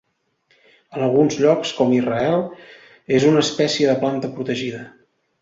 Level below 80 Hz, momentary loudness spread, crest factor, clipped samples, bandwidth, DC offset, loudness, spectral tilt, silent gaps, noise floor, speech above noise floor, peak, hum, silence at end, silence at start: -60 dBFS; 10 LU; 18 dB; under 0.1%; 8 kHz; under 0.1%; -19 LUFS; -5.5 dB/octave; none; -65 dBFS; 46 dB; -2 dBFS; none; 0.55 s; 0.9 s